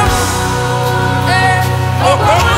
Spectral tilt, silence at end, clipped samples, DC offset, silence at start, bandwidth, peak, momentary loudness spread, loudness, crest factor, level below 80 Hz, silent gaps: -4.5 dB/octave; 0 s; under 0.1%; under 0.1%; 0 s; 16.5 kHz; 0 dBFS; 4 LU; -12 LUFS; 10 dB; -26 dBFS; none